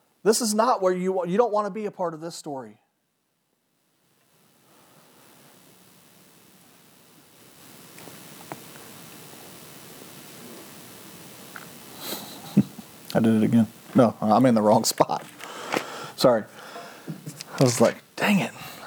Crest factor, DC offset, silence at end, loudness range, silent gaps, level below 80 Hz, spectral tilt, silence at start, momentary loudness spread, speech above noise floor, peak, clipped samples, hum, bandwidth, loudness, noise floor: 20 dB; under 0.1%; 0 s; 22 LU; none; -70 dBFS; -5 dB/octave; 0.25 s; 22 LU; 52 dB; -6 dBFS; under 0.1%; none; over 20 kHz; -23 LUFS; -73 dBFS